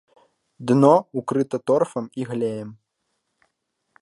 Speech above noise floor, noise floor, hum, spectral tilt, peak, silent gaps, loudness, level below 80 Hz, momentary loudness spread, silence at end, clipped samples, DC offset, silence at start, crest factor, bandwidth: 55 dB; -76 dBFS; none; -8 dB/octave; -2 dBFS; none; -21 LUFS; -72 dBFS; 17 LU; 1.3 s; under 0.1%; under 0.1%; 0.6 s; 22 dB; 11.5 kHz